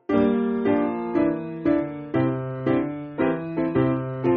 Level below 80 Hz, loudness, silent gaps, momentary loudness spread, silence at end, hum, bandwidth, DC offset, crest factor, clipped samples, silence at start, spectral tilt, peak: -52 dBFS; -24 LUFS; none; 4 LU; 0 s; none; 4.7 kHz; under 0.1%; 16 dB; under 0.1%; 0.1 s; -7.5 dB/octave; -8 dBFS